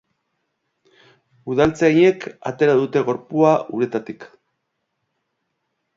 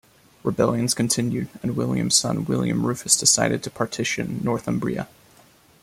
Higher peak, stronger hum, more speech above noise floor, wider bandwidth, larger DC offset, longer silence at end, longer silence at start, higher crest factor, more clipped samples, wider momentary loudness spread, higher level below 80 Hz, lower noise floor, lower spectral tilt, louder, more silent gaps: about the same, -2 dBFS vs -2 dBFS; neither; first, 57 dB vs 31 dB; second, 7.6 kHz vs 16 kHz; neither; first, 1.7 s vs 0.75 s; first, 1.45 s vs 0.45 s; about the same, 20 dB vs 22 dB; neither; first, 14 LU vs 11 LU; about the same, -56 dBFS vs -54 dBFS; first, -75 dBFS vs -54 dBFS; first, -7 dB/octave vs -3.5 dB/octave; first, -18 LUFS vs -22 LUFS; neither